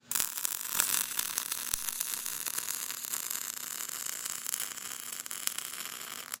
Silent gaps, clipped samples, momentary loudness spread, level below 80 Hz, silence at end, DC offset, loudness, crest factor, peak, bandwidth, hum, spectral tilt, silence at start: none; under 0.1%; 9 LU; -66 dBFS; 0 s; under 0.1%; -33 LUFS; 34 dB; -2 dBFS; 17 kHz; none; 1.5 dB/octave; 0.05 s